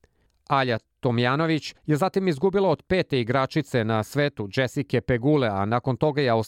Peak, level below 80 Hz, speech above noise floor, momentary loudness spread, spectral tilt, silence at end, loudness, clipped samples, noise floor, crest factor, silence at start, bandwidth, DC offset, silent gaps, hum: -8 dBFS; -54 dBFS; 29 dB; 5 LU; -7 dB/octave; 0 s; -24 LUFS; under 0.1%; -53 dBFS; 16 dB; 0.5 s; 16 kHz; under 0.1%; none; none